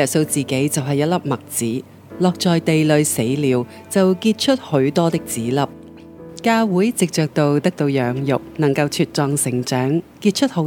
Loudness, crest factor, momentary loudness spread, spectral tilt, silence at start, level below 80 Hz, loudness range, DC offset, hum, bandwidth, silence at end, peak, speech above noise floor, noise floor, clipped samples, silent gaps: -19 LUFS; 18 dB; 6 LU; -5 dB/octave; 0 s; -58 dBFS; 2 LU; under 0.1%; none; 18 kHz; 0 s; -2 dBFS; 20 dB; -38 dBFS; under 0.1%; none